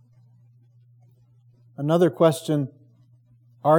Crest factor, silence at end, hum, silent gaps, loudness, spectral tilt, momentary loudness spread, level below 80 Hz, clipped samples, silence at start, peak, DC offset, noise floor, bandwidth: 20 dB; 0 s; none; none; -22 LUFS; -7 dB/octave; 15 LU; -82 dBFS; under 0.1%; 1.8 s; -6 dBFS; under 0.1%; -56 dBFS; 18.5 kHz